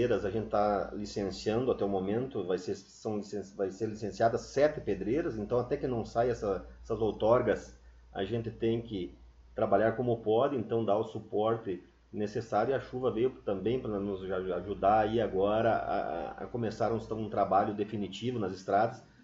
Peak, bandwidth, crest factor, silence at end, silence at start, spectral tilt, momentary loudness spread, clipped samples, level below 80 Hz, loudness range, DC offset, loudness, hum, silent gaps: -12 dBFS; 7.8 kHz; 18 dB; 0.25 s; 0 s; -7 dB/octave; 10 LU; under 0.1%; -54 dBFS; 2 LU; under 0.1%; -32 LUFS; none; none